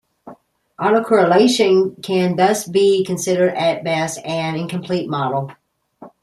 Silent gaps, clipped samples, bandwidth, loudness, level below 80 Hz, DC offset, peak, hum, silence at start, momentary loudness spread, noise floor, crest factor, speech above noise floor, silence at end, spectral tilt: none; under 0.1%; 14 kHz; -17 LUFS; -62 dBFS; under 0.1%; -2 dBFS; none; 0.25 s; 9 LU; -45 dBFS; 16 dB; 29 dB; 0.15 s; -5 dB/octave